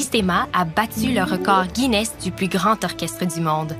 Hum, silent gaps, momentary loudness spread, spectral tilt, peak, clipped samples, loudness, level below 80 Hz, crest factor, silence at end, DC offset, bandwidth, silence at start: none; none; 6 LU; -4.5 dB/octave; -4 dBFS; under 0.1%; -20 LUFS; -44 dBFS; 16 dB; 0 s; under 0.1%; 15.5 kHz; 0 s